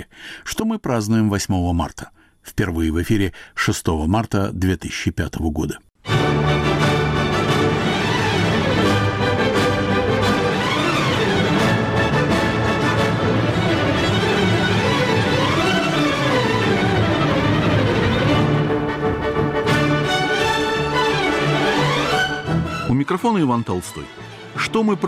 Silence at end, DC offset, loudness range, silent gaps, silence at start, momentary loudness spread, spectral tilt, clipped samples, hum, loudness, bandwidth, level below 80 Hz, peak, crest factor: 0 s; under 0.1%; 4 LU; none; 0 s; 6 LU; -5.5 dB/octave; under 0.1%; none; -19 LUFS; 15.5 kHz; -36 dBFS; -8 dBFS; 10 dB